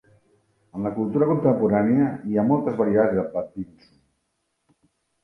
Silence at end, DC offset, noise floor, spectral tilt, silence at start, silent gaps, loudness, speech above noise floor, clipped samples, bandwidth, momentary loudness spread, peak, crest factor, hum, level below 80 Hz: 1.6 s; under 0.1%; -74 dBFS; -11 dB/octave; 0.75 s; none; -22 LUFS; 53 dB; under 0.1%; 5.4 kHz; 14 LU; -6 dBFS; 18 dB; none; -58 dBFS